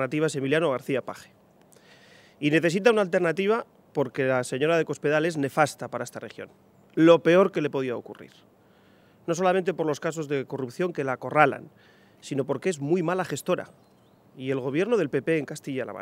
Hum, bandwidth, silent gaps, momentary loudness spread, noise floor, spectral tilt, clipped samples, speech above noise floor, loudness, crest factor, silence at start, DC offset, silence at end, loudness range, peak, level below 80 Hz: none; 16 kHz; none; 15 LU; -58 dBFS; -5.5 dB/octave; under 0.1%; 33 dB; -25 LUFS; 24 dB; 0 s; under 0.1%; 0 s; 5 LU; -2 dBFS; -74 dBFS